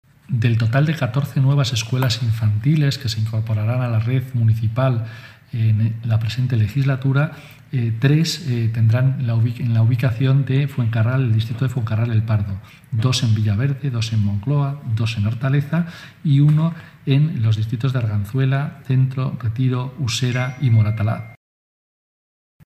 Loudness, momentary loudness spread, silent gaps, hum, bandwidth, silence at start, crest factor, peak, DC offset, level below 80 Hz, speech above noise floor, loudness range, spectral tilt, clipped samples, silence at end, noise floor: -20 LUFS; 6 LU; none; none; 13.5 kHz; 0.3 s; 16 dB; -4 dBFS; under 0.1%; -52 dBFS; over 72 dB; 2 LU; -6.5 dB/octave; under 0.1%; 1.3 s; under -90 dBFS